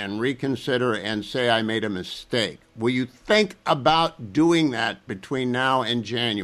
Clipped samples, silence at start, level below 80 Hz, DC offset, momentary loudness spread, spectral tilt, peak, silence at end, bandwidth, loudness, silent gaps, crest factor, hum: under 0.1%; 0 s; -56 dBFS; under 0.1%; 8 LU; -5 dB/octave; -6 dBFS; 0 s; 13.5 kHz; -23 LUFS; none; 18 dB; none